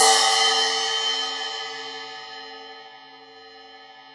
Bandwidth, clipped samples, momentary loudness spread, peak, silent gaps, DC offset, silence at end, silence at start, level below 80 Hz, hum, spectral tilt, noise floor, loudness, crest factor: 11.5 kHz; under 0.1%; 23 LU; -4 dBFS; none; under 0.1%; 0 s; 0 s; -72 dBFS; none; 2.5 dB/octave; -46 dBFS; -21 LUFS; 20 dB